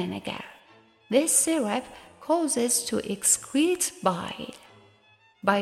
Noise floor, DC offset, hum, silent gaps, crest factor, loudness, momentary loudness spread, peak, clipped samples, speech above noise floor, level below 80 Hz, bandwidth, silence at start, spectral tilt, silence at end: -60 dBFS; under 0.1%; none; none; 20 dB; -25 LUFS; 17 LU; -8 dBFS; under 0.1%; 34 dB; -66 dBFS; 15.5 kHz; 0 s; -2.5 dB/octave; 0 s